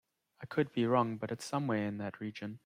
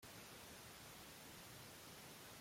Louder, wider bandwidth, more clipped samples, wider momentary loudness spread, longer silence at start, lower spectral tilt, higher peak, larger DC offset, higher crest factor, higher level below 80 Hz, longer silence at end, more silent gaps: first, -35 LUFS vs -57 LUFS; about the same, 15.5 kHz vs 16.5 kHz; neither; first, 11 LU vs 0 LU; first, 0.4 s vs 0 s; first, -6.5 dB/octave vs -2.5 dB/octave; first, -16 dBFS vs -46 dBFS; neither; first, 20 dB vs 12 dB; about the same, -76 dBFS vs -76 dBFS; about the same, 0.1 s vs 0 s; neither